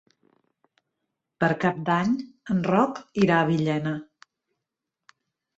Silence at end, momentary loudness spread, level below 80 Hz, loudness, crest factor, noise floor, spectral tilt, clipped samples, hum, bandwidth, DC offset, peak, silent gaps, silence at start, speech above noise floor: 1.55 s; 8 LU; -62 dBFS; -24 LUFS; 18 dB; -85 dBFS; -7.5 dB/octave; under 0.1%; none; 8 kHz; under 0.1%; -8 dBFS; none; 1.4 s; 62 dB